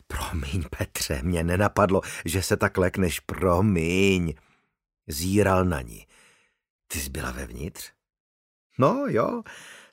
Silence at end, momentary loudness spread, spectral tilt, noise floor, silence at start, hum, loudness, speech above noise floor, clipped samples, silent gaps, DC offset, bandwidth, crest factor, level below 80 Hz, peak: 0.15 s; 14 LU; -5.5 dB/octave; -61 dBFS; 0.1 s; none; -25 LUFS; 37 dB; under 0.1%; 6.70-6.79 s, 8.20-8.70 s; under 0.1%; 16 kHz; 20 dB; -42 dBFS; -6 dBFS